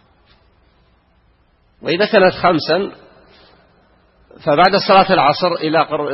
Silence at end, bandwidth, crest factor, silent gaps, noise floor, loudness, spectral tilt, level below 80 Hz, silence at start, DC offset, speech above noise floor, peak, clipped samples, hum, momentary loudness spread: 0 s; 6 kHz; 16 dB; none; -56 dBFS; -14 LUFS; -7.5 dB/octave; -52 dBFS; 1.85 s; under 0.1%; 42 dB; 0 dBFS; under 0.1%; none; 11 LU